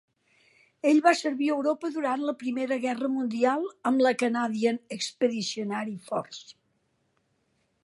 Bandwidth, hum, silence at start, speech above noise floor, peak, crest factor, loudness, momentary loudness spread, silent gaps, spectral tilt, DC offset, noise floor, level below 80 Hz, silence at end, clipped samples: 11.5 kHz; none; 0.85 s; 46 dB; -6 dBFS; 22 dB; -27 LUFS; 10 LU; none; -4 dB/octave; under 0.1%; -73 dBFS; -82 dBFS; 1.35 s; under 0.1%